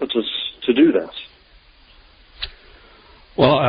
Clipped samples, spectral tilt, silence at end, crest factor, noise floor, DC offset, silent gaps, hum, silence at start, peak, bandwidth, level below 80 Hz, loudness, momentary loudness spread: under 0.1%; -11 dB/octave; 0 s; 18 dB; -50 dBFS; under 0.1%; none; none; 0 s; -2 dBFS; 5.2 kHz; -50 dBFS; -20 LUFS; 18 LU